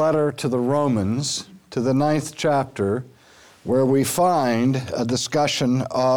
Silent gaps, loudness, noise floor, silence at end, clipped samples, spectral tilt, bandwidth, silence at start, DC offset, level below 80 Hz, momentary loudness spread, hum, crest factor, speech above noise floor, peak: none; -21 LUFS; -51 dBFS; 0 s; under 0.1%; -5.5 dB/octave; over 20 kHz; 0 s; 0.2%; -56 dBFS; 6 LU; none; 12 dB; 30 dB; -8 dBFS